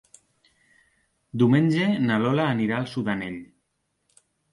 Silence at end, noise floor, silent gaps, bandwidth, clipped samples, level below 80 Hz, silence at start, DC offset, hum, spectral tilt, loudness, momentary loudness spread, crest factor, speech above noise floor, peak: 1.1 s; -75 dBFS; none; 11.5 kHz; under 0.1%; -62 dBFS; 1.35 s; under 0.1%; none; -7.5 dB/octave; -23 LUFS; 14 LU; 16 dB; 52 dB; -8 dBFS